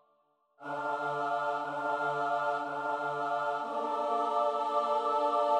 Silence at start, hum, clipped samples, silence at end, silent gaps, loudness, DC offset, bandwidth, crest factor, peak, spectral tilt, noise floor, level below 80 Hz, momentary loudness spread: 0.6 s; none; under 0.1%; 0 s; none; -32 LUFS; under 0.1%; 11 kHz; 14 dB; -18 dBFS; -5 dB/octave; -72 dBFS; -82 dBFS; 5 LU